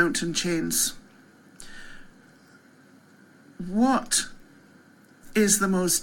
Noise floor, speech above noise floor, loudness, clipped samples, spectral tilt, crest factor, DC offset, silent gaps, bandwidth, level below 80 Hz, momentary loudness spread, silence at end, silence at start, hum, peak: -55 dBFS; 31 dB; -24 LUFS; under 0.1%; -3 dB/octave; 20 dB; under 0.1%; none; 17 kHz; -52 dBFS; 23 LU; 0 s; 0 s; none; -8 dBFS